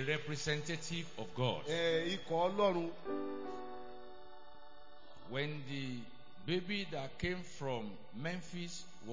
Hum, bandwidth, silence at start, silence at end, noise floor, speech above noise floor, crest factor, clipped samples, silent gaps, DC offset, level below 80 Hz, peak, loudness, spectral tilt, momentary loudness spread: none; 7.6 kHz; 0 s; 0 s; -60 dBFS; 21 dB; 20 dB; under 0.1%; none; 0.5%; -64 dBFS; -20 dBFS; -39 LUFS; -5 dB/octave; 22 LU